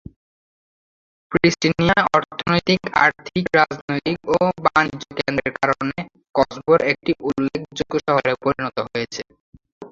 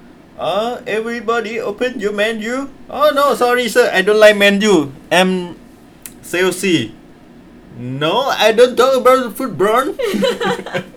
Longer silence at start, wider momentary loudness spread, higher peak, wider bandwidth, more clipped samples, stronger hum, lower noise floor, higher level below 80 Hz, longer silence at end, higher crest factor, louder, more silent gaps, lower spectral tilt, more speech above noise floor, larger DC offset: first, 1.3 s vs 0.4 s; second, 9 LU vs 12 LU; about the same, 0 dBFS vs 0 dBFS; second, 7.6 kHz vs 19 kHz; neither; neither; first, under -90 dBFS vs -41 dBFS; about the same, -48 dBFS vs -50 dBFS; about the same, 0.05 s vs 0.05 s; about the same, 20 dB vs 16 dB; second, -20 LUFS vs -14 LUFS; first, 3.81-3.88 s, 9.40-9.53 s, 9.72-9.81 s vs none; first, -5.5 dB/octave vs -4 dB/octave; first, over 70 dB vs 26 dB; neither